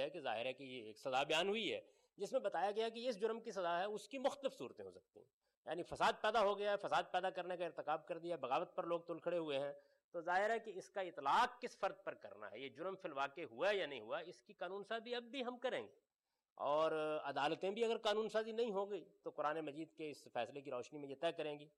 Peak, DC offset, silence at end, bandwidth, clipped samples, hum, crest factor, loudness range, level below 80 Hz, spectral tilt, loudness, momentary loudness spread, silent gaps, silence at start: -28 dBFS; under 0.1%; 0.1 s; 12 kHz; under 0.1%; none; 16 dB; 4 LU; -82 dBFS; -4 dB/octave; -42 LUFS; 13 LU; 5.33-5.41 s, 5.57-5.63 s, 10.04-10.12 s, 16.52-16.56 s; 0 s